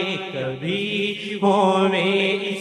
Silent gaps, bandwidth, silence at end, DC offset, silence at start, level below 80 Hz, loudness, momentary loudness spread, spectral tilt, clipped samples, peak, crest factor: none; 11 kHz; 0 s; under 0.1%; 0 s; -68 dBFS; -21 LUFS; 9 LU; -5.5 dB/octave; under 0.1%; -6 dBFS; 16 dB